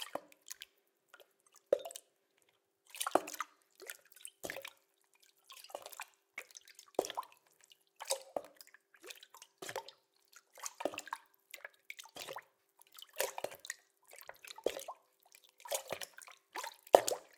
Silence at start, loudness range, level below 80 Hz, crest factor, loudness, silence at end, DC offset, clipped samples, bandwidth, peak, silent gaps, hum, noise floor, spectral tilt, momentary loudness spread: 0 s; 6 LU; -84 dBFS; 40 dB; -41 LUFS; 0.15 s; under 0.1%; under 0.1%; 18 kHz; -2 dBFS; none; none; -76 dBFS; -1 dB/octave; 19 LU